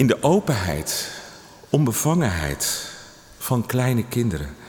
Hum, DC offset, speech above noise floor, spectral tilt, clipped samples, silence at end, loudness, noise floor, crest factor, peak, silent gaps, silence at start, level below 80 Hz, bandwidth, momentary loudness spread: none; under 0.1%; 22 dB; -5 dB/octave; under 0.1%; 0 s; -22 LUFS; -43 dBFS; 18 dB; -4 dBFS; none; 0 s; -44 dBFS; 19.5 kHz; 13 LU